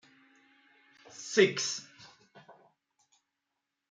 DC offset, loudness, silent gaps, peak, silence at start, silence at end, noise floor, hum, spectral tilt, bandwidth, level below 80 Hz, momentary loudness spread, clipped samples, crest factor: under 0.1%; -29 LUFS; none; -10 dBFS; 1.15 s; 1.4 s; -86 dBFS; none; -3 dB/octave; 9.4 kHz; -82 dBFS; 26 LU; under 0.1%; 26 dB